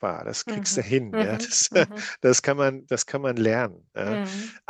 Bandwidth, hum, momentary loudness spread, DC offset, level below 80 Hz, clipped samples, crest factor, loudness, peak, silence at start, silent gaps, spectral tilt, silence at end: 10 kHz; none; 10 LU; under 0.1%; -68 dBFS; under 0.1%; 20 dB; -24 LUFS; -4 dBFS; 0 s; none; -3.5 dB/octave; 0.1 s